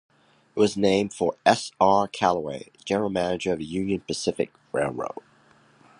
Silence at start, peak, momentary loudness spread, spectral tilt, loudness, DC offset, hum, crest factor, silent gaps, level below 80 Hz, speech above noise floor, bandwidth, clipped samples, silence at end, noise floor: 0.55 s; -2 dBFS; 13 LU; -5 dB/octave; -25 LUFS; under 0.1%; none; 22 dB; none; -58 dBFS; 34 dB; 11 kHz; under 0.1%; 0.9 s; -58 dBFS